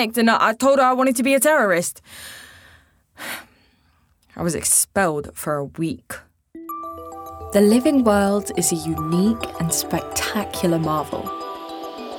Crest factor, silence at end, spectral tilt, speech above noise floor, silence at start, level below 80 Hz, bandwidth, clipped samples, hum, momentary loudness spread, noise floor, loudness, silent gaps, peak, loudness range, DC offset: 18 dB; 0 s; -4 dB/octave; 41 dB; 0 s; -52 dBFS; over 20 kHz; under 0.1%; none; 19 LU; -60 dBFS; -19 LUFS; none; -2 dBFS; 4 LU; under 0.1%